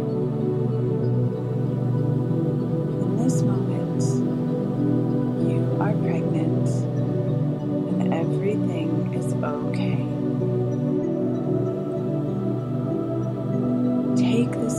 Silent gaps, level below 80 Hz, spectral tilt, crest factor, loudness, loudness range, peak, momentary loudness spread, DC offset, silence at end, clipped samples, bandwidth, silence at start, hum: none; -54 dBFS; -8.5 dB/octave; 14 dB; -24 LUFS; 2 LU; -10 dBFS; 4 LU; under 0.1%; 0 s; under 0.1%; 11.5 kHz; 0 s; none